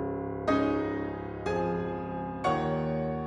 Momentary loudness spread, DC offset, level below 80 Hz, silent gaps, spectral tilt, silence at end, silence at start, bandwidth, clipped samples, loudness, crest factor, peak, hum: 8 LU; under 0.1%; -50 dBFS; none; -7.5 dB/octave; 0 s; 0 s; 10 kHz; under 0.1%; -31 LUFS; 16 dB; -14 dBFS; none